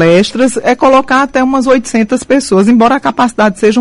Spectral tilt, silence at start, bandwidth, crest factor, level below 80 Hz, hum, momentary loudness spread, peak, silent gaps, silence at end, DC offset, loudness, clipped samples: -5 dB/octave; 0 s; 11.5 kHz; 8 dB; -42 dBFS; none; 4 LU; 0 dBFS; none; 0 s; under 0.1%; -9 LUFS; under 0.1%